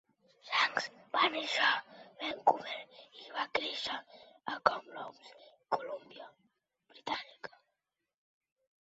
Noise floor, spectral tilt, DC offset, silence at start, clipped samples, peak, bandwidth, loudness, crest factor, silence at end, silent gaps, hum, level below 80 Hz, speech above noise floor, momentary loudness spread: -88 dBFS; 1.5 dB/octave; under 0.1%; 0.45 s; under 0.1%; -8 dBFS; 7.6 kHz; -34 LUFS; 30 dB; 1.35 s; none; none; -80 dBFS; 53 dB; 21 LU